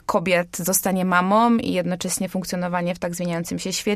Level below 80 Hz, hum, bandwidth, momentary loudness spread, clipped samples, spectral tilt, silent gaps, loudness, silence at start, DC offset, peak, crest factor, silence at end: -54 dBFS; none; 15.5 kHz; 8 LU; under 0.1%; -4.5 dB/octave; none; -22 LUFS; 0.1 s; under 0.1%; -4 dBFS; 16 dB; 0 s